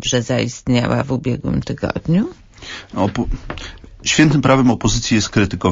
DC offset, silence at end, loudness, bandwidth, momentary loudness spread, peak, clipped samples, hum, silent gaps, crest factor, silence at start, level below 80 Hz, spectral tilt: under 0.1%; 0 s; -17 LUFS; 7.8 kHz; 17 LU; -2 dBFS; under 0.1%; none; none; 16 dB; 0 s; -34 dBFS; -5 dB/octave